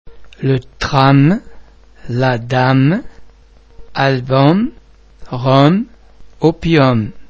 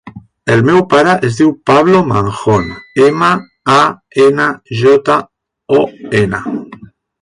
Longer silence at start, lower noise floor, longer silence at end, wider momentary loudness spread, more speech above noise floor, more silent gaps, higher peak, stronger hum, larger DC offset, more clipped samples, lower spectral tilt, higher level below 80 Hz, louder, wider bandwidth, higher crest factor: about the same, 0.05 s vs 0.05 s; first, -44 dBFS vs -36 dBFS; second, 0.05 s vs 0.4 s; first, 11 LU vs 7 LU; first, 32 dB vs 26 dB; neither; about the same, 0 dBFS vs 0 dBFS; neither; neither; first, 0.1% vs under 0.1%; about the same, -7.5 dB/octave vs -6.5 dB/octave; about the same, -40 dBFS vs -44 dBFS; second, -14 LUFS vs -11 LUFS; second, 7.4 kHz vs 11 kHz; about the same, 14 dB vs 12 dB